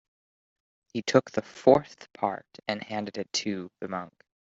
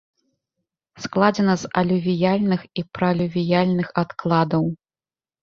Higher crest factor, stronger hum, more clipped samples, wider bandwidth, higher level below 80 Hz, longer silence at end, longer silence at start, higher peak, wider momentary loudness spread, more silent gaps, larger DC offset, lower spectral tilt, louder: about the same, 24 dB vs 20 dB; neither; neither; about the same, 7.8 kHz vs 7.2 kHz; second, -66 dBFS vs -56 dBFS; second, 0.45 s vs 0.65 s; about the same, 0.95 s vs 0.95 s; about the same, -4 dBFS vs -2 dBFS; first, 15 LU vs 8 LU; neither; neither; second, -4.5 dB/octave vs -7 dB/octave; second, -28 LUFS vs -21 LUFS